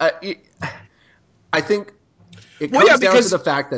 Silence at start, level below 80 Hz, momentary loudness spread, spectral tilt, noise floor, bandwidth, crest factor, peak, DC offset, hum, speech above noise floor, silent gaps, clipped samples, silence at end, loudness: 0 s; -60 dBFS; 19 LU; -3.5 dB/octave; -56 dBFS; 8 kHz; 18 dB; 0 dBFS; under 0.1%; none; 39 dB; none; under 0.1%; 0 s; -16 LUFS